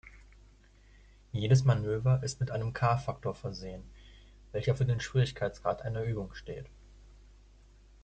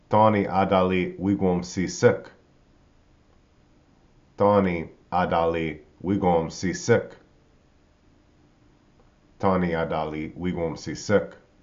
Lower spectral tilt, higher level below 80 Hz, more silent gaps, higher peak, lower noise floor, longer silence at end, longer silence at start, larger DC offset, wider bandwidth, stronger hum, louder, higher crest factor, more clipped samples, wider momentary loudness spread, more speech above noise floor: about the same, -6.5 dB/octave vs -6 dB/octave; about the same, -52 dBFS vs -52 dBFS; neither; second, -14 dBFS vs -4 dBFS; about the same, -59 dBFS vs -59 dBFS; first, 1.1 s vs 0.25 s; about the same, 0.05 s vs 0.1 s; neither; first, 8.8 kHz vs 7.6 kHz; neither; second, -32 LUFS vs -24 LUFS; about the same, 20 dB vs 20 dB; neither; first, 17 LU vs 11 LU; second, 28 dB vs 36 dB